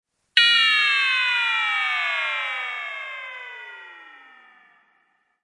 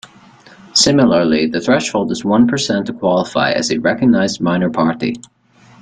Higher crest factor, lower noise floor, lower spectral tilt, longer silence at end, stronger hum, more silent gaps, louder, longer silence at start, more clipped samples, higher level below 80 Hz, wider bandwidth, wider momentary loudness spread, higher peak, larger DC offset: first, 24 dB vs 16 dB; first, -67 dBFS vs -43 dBFS; second, 2.5 dB/octave vs -4.5 dB/octave; first, 1.25 s vs 0.6 s; neither; neither; second, -19 LUFS vs -15 LUFS; second, 0.35 s vs 0.75 s; neither; second, -88 dBFS vs -50 dBFS; first, 11.5 kHz vs 9.4 kHz; first, 21 LU vs 7 LU; about the same, 0 dBFS vs 0 dBFS; neither